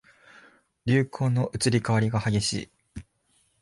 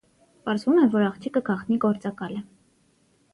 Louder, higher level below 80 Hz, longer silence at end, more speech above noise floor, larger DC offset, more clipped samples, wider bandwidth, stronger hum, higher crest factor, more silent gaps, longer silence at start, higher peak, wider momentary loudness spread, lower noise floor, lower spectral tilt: about the same, -26 LUFS vs -24 LUFS; first, -52 dBFS vs -66 dBFS; second, 0.6 s vs 0.9 s; about the same, 44 dB vs 41 dB; neither; neither; about the same, 11.5 kHz vs 11 kHz; neither; about the same, 16 dB vs 16 dB; neither; first, 0.85 s vs 0.45 s; about the same, -10 dBFS vs -8 dBFS; first, 20 LU vs 15 LU; first, -68 dBFS vs -64 dBFS; second, -5.5 dB/octave vs -7.5 dB/octave